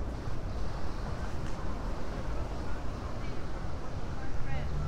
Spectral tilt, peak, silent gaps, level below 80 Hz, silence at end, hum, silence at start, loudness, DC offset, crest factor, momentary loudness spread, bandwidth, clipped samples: -6.5 dB/octave; -18 dBFS; none; -38 dBFS; 0 s; none; 0 s; -39 LUFS; under 0.1%; 14 dB; 2 LU; 9.4 kHz; under 0.1%